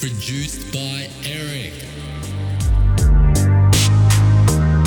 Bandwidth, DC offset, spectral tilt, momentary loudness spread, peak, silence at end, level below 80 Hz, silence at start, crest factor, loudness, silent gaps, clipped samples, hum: 19 kHz; under 0.1%; -5 dB/octave; 15 LU; -4 dBFS; 0 s; -20 dBFS; 0 s; 12 dB; -17 LUFS; none; under 0.1%; none